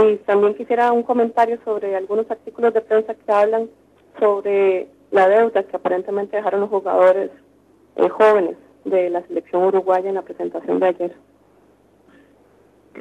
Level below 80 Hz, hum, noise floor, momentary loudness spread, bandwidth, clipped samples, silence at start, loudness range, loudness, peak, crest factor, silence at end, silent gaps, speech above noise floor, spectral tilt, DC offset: -68 dBFS; none; -54 dBFS; 11 LU; 9.2 kHz; under 0.1%; 0 s; 4 LU; -19 LUFS; -2 dBFS; 16 dB; 0 s; none; 36 dB; -6.5 dB/octave; under 0.1%